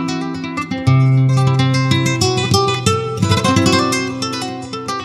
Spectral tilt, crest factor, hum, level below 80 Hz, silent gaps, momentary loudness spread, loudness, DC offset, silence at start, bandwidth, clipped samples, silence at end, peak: -5 dB/octave; 14 dB; none; -44 dBFS; none; 10 LU; -16 LUFS; under 0.1%; 0 s; 13.5 kHz; under 0.1%; 0 s; 0 dBFS